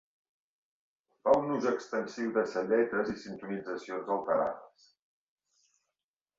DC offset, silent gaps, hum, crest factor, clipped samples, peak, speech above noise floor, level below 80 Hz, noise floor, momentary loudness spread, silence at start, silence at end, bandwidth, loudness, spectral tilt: under 0.1%; none; none; 22 dB; under 0.1%; -10 dBFS; over 59 dB; -72 dBFS; under -90 dBFS; 11 LU; 1.25 s; 1.7 s; 7.8 kHz; -32 LUFS; -6 dB/octave